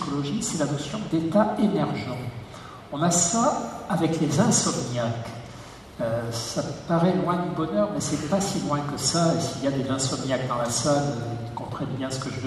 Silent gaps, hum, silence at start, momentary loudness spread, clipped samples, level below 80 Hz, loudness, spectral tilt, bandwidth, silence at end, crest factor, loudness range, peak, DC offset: none; none; 0 s; 12 LU; under 0.1%; -52 dBFS; -25 LUFS; -4.5 dB/octave; 13.5 kHz; 0 s; 20 dB; 3 LU; -6 dBFS; under 0.1%